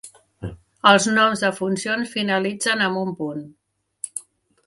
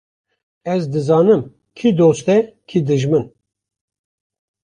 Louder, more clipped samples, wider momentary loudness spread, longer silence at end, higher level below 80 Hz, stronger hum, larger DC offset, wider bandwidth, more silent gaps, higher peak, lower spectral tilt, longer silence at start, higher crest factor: second, -20 LUFS vs -16 LUFS; neither; first, 20 LU vs 10 LU; second, 0.45 s vs 1.4 s; about the same, -56 dBFS vs -56 dBFS; neither; neither; first, 11.5 kHz vs 10 kHz; neither; about the same, 0 dBFS vs -2 dBFS; second, -3.5 dB/octave vs -7.5 dB/octave; second, 0.05 s vs 0.65 s; first, 22 dB vs 16 dB